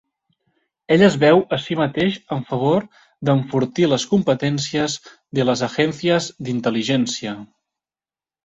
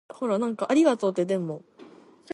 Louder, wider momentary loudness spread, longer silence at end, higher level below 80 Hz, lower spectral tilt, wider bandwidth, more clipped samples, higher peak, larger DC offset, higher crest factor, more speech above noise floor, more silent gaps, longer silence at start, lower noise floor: first, -19 LUFS vs -25 LUFS; about the same, 11 LU vs 11 LU; first, 1 s vs 0.5 s; first, -56 dBFS vs -78 dBFS; about the same, -5.5 dB/octave vs -6 dB/octave; second, 8.2 kHz vs 11.5 kHz; neither; first, -2 dBFS vs -10 dBFS; neither; about the same, 18 dB vs 16 dB; first, over 71 dB vs 26 dB; neither; first, 0.9 s vs 0.15 s; first, under -90 dBFS vs -50 dBFS